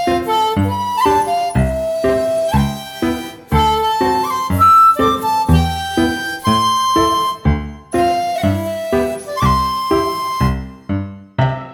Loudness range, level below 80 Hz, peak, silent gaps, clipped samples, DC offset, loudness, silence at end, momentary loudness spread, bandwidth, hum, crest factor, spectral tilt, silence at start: 4 LU; -30 dBFS; -2 dBFS; none; under 0.1%; under 0.1%; -16 LUFS; 0 s; 8 LU; over 20 kHz; none; 14 dB; -5.5 dB/octave; 0 s